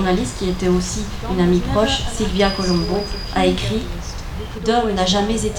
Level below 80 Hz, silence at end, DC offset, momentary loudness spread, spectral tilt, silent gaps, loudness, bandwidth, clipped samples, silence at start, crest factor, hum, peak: -28 dBFS; 0 s; under 0.1%; 8 LU; -5 dB/octave; none; -19 LUFS; 18.5 kHz; under 0.1%; 0 s; 16 dB; none; -2 dBFS